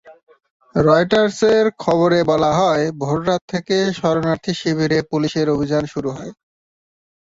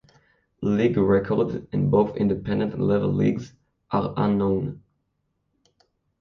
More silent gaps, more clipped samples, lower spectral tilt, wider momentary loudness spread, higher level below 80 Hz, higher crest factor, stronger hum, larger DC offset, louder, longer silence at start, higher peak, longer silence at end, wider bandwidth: first, 0.23-0.27 s, 0.51-0.60 s, 3.41-3.48 s vs none; neither; second, -6 dB/octave vs -9.5 dB/octave; about the same, 8 LU vs 7 LU; about the same, -48 dBFS vs -50 dBFS; about the same, 16 dB vs 18 dB; neither; neither; first, -18 LUFS vs -23 LUFS; second, 0.05 s vs 0.6 s; first, -2 dBFS vs -8 dBFS; second, 1 s vs 1.4 s; first, 8 kHz vs 6.6 kHz